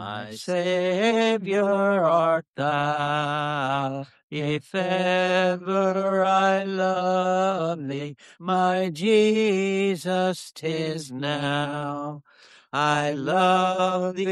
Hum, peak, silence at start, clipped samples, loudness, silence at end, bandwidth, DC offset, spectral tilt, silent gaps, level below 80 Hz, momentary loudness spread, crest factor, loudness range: none; -8 dBFS; 0 s; under 0.1%; -23 LUFS; 0 s; 13 kHz; under 0.1%; -5.5 dB/octave; 2.48-2.54 s, 4.23-4.29 s; -70 dBFS; 11 LU; 16 dB; 3 LU